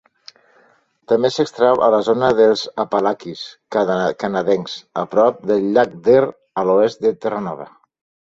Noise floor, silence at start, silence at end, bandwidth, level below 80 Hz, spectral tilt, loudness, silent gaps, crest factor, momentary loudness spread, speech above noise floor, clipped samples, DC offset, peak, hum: -56 dBFS; 1.1 s; 0.6 s; 7.8 kHz; -58 dBFS; -6 dB/octave; -17 LUFS; none; 16 dB; 11 LU; 40 dB; under 0.1%; under 0.1%; -2 dBFS; none